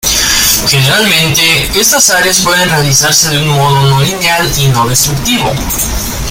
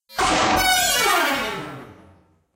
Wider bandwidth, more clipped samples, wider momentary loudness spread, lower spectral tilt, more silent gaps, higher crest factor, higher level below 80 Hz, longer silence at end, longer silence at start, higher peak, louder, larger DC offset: first, over 20 kHz vs 16 kHz; first, 0.2% vs under 0.1%; second, 6 LU vs 17 LU; about the same, -2.5 dB/octave vs -1.5 dB/octave; neither; about the same, 10 dB vs 14 dB; first, -26 dBFS vs -42 dBFS; second, 0 s vs 0.6 s; about the same, 0.05 s vs 0.1 s; first, 0 dBFS vs -6 dBFS; first, -7 LUFS vs -18 LUFS; neither